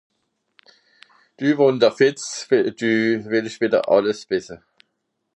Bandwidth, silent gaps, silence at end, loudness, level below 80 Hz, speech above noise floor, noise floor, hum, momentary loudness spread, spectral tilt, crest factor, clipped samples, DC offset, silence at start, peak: 10.5 kHz; none; 0.8 s; -20 LUFS; -66 dBFS; 56 dB; -75 dBFS; none; 9 LU; -5 dB/octave; 18 dB; under 0.1%; under 0.1%; 1.4 s; -2 dBFS